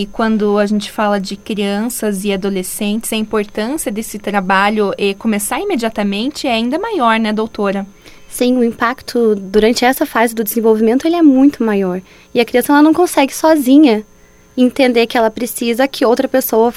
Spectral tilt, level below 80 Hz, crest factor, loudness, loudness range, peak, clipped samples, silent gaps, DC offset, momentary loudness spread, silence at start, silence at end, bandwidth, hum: -4.5 dB/octave; -44 dBFS; 14 dB; -14 LUFS; 5 LU; 0 dBFS; under 0.1%; none; under 0.1%; 9 LU; 0 s; 0 s; 16.5 kHz; none